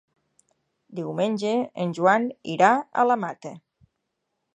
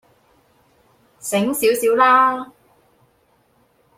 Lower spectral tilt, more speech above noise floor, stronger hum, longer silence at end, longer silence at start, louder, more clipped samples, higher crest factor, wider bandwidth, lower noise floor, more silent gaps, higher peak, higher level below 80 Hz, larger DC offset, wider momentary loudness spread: first, -6 dB/octave vs -3.5 dB/octave; first, 56 dB vs 44 dB; neither; second, 1 s vs 1.5 s; second, 0.9 s vs 1.25 s; second, -23 LUFS vs -16 LUFS; neither; about the same, 22 dB vs 20 dB; second, 9.4 kHz vs 16.5 kHz; first, -79 dBFS vs -60 dBFS; neither; about the same, -4 dBFS vs -2 dBFS; second, -76 dBFS vs -66 dBFS; neither; about the same, 16 LU vs 18 LU